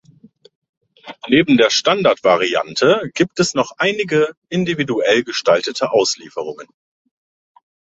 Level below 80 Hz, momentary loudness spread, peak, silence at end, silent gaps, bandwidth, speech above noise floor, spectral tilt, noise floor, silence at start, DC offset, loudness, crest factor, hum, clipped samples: -58 dBFS; 9 LU; 0 dBFS; 1.25 s; 4.37-4.42 s; 8.2 kHz; 32 dB; -4 dB/octave; -48 dBFS; 1.05 s; under 0.1%; -16 LUFS; 16 dB; none; under 0.1%